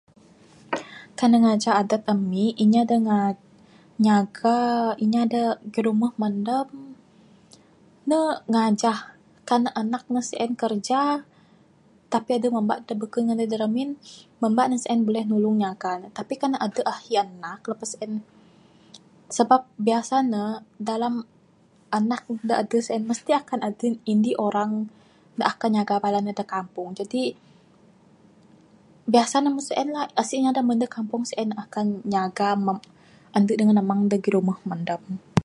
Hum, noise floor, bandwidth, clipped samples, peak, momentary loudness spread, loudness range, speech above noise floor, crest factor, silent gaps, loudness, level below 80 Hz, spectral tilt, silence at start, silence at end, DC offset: none; -58 dBFS; 11.5 kHz; under 0.1%; -2 dBFS; 12 LU; 5 LU; 35 dB; 22 dB; none; -24 LUFS; -68 dBFS; -5.5 dB/octave; 0.7 s; 0 s; under 0.1%